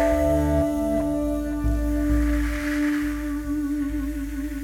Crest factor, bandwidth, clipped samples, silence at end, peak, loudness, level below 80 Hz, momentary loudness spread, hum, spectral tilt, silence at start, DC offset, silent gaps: 14 dB; 16.5 kHz; under 0.1%; 0 s; -10 dBFS; -25 LUFS; -28 dBFS; 7 LU; none; -7 dB/octave; 0 s; under 0.1%; none